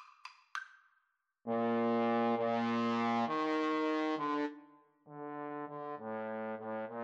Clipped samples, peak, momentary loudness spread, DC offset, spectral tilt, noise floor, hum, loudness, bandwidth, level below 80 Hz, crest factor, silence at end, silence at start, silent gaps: under 0.1%; -22 dBFS; 16 LU; under 0.1%; -6 dB/octave; -80 dBFS; none; -36 LUFS; 7.8 kHz; under -90 dBFS; 14 dB; 0 s; 0 s; none